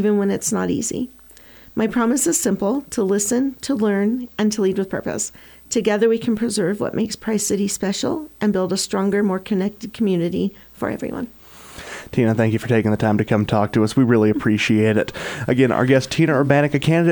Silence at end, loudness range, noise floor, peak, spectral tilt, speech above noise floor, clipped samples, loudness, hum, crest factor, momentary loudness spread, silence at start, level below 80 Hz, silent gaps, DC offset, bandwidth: 0 s; 4 LU; -45 dBFS; -2 dBFS; -5 dB/octave; 26 dB; under 0.1%; -20 LUFS; none; 18 dB; 10 LU; 0 s; -52 dBFS; none; under 0.1%; 20 kHz